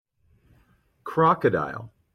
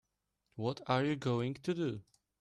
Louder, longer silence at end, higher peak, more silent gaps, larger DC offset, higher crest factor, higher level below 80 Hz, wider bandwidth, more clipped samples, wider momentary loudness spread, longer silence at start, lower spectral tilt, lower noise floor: first, -23 LUFS vs -36 LUFS; second, 0.25 s vs 0.4 s; first, -8 dBFS vs -18 dBFS; neither; neither; about the same, 20 dB vs 20 dB; first, -60 dBFS vs -72 dBFS; about the same, 12.5 kHz vs 11.5 kHz; neither; first, 19 LU vs 10 LU; first, 1.05 s vs 0.55 s; first, -8.5 dB/octave vs -7 dB/octave; second, -63 dBFS vs -82 dBFS